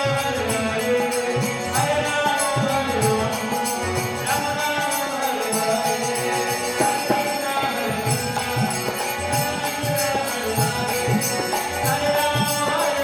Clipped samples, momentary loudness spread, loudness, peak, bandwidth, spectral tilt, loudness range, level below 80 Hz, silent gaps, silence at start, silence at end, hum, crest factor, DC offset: under 0.1%; 3 LU; -22 LUFS; -6 dBFS; 17 kHz; -3.5 dB/octave; 1 LU; -50 dBFS; none; 0 s; 0 s; none; 16 dB; under 0.1%